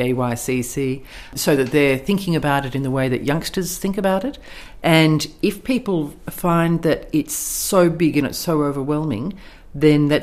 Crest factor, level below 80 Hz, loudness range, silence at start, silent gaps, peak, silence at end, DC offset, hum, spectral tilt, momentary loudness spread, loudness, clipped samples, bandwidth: 18 dB; -42 dBFS; 1 LU; 0 s; none; 0 dBFS; 0 s; under 0.1%; none; -5 dB/octave; 10 LU; -19 LUFS; under 0.1%; 15.5 kHz